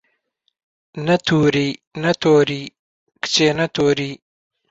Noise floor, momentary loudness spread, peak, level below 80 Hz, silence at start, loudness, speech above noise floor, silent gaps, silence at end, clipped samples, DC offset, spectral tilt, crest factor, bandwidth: -69 dBFS; 14 LU; -2 dBFS; -54 dBFS; 0.95 s; -18 LUFS; 51 dB; 1.87-1.91 s, 2.79-3.07 s; 0.55 s; under 0.1%; under 0.1%; -5 dB/octave; 16 dB; 8 kHz